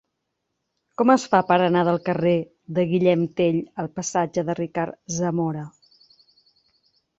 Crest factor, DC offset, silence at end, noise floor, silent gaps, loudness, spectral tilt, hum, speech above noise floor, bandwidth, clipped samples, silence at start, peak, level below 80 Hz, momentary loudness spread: 20 dB; under 0.1%; 1.5 s; -78 dBFS; none; -22 LUFS; -6 dB/octave; none; 57 dB; 8 kHz; under 0.1%; 1 s; -4 dBFS; -62 dBFS; 10 LU